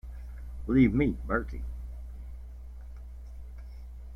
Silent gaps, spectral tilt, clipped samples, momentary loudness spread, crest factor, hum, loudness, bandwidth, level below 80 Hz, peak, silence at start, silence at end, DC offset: none; -9.5 dB/octave; under 0.1%; 22 LU; 20 dB; 60 Hz at -40 dBFS; -28 LUFS; 5.8 kHz; -40 dBFS; -12 dBFS; 0.05 s; 0 s; under 0.1%